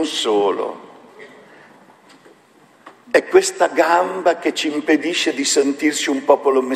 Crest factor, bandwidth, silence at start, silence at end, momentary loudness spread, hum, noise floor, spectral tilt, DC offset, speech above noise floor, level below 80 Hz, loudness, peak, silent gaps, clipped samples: 18 dB; 13.5 kHz; 0 s; 0 s; 6 LU; none; -51 dBFS; -2 dB/octave; under 0.1%; 34 dB; -68 dBFS; -17 LUFS; 0 dBFS; none; under 0.1%